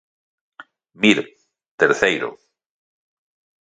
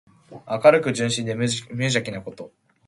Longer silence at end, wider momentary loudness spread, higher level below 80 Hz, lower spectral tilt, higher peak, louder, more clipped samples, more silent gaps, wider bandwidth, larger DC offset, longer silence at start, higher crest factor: first, 1.25 s vs 0.4 s; second, 12 LU vs 21 LU; about the same, -62 dBFS vs -60 dBFS; about the same, -4 dB/octave vs -4.5 dB/octave; about the same, 0 dBFS vs -2 dBFS; first, -18 LUFS vs -21 LUFS; neither; first, 1.68-1.78 s vs none; second, 9.4 kHz vs 11.5 kHz; neither; first, 0.6 s vs 0.3 s; about the same, 22 dB vs 22 dB